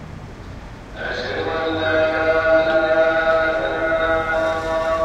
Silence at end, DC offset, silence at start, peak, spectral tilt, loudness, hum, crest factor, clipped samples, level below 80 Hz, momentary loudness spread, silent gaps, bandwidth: 0 s; under 0.1%; 0 s; -6 dBFS; -5.5 dB/octave; -19 LUFS; none; 14 dB; under 0.1%; -40 dBFS; 20 LU; none; 8.8 kHz